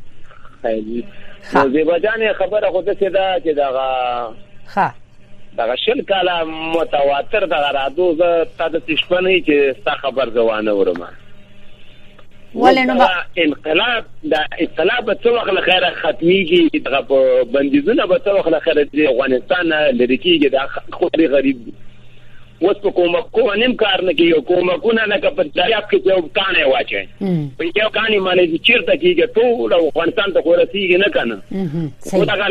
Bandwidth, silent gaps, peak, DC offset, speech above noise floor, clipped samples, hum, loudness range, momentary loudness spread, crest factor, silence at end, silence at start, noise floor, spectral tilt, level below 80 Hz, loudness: 11 kHz; none; 0 dBFS; under 0.1%; 20 dB; under 0.1%; none; 4 LU; 8 LU; 16 dB; 0 s; 0 s; -35 dBFS; -6 dB/octave; -44 dBFS; -16 LUFS